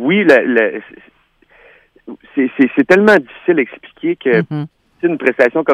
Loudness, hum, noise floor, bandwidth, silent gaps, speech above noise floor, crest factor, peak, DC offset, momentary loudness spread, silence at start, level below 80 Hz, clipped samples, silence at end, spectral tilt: -14 LUFS; none; -52 dBFS; 11.5 kHz; none; 39 dB; 14 dB; 0 dBFS; under 0.1%; 13 LU; 0 s; -58 dBFS; under 0.1%; 0 s; -7 dB/octave